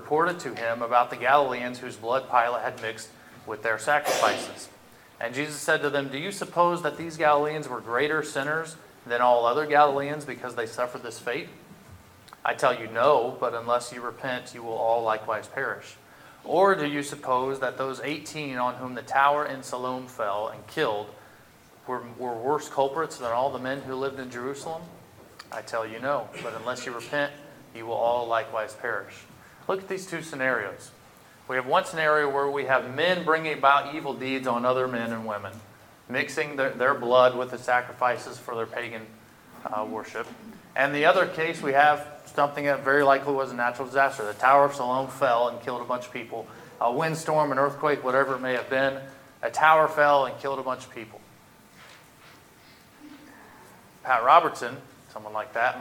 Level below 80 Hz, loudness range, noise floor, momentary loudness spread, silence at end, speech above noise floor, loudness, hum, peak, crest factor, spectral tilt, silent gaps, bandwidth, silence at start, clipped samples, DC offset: -70 dBFS; 7 LU; -54 dBFS; 15 LU; 0 s; 28 dB; -26 LUFS; none; -2 dBFS; 24 dB; -4 dB/octave; none; 17.5 kHz; 0 s; under 0.1%; under 0.1%